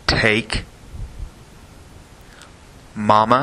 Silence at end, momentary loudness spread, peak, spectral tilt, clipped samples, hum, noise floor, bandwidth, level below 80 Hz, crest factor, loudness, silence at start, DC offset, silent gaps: 0 s; 23 LU; 0 dBFS; -5 dB/octave; under 0.1%; none; -44 dBFS; 13 kHz; -36 dBFS; 20 dB; -18 LUFS; 0.1 s; under 0.1%; none